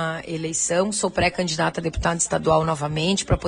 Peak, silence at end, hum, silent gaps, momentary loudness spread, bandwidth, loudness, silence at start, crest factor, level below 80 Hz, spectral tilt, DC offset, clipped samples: -6 dBFS; 0 s; none; none; 5 LU; 10 kHz; -22 LUFS; 0 s; 16 dB; -38 dBFS; -4 dB/octave; under 0.1%; under 0.1%